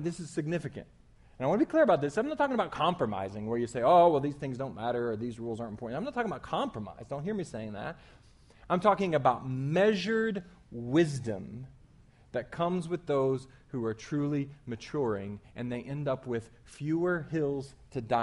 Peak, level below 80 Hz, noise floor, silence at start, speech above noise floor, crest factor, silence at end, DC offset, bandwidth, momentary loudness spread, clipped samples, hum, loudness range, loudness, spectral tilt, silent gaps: -10 dBFS; -60 dBFS; -59 dBFS; 0 s; 28 dB; 20 dB; 0 s; under 0.1%; 11.5 kHz; 14 LU; under 0.1%; none; 7 LU; -31 LUFS; -7 dB/octave; none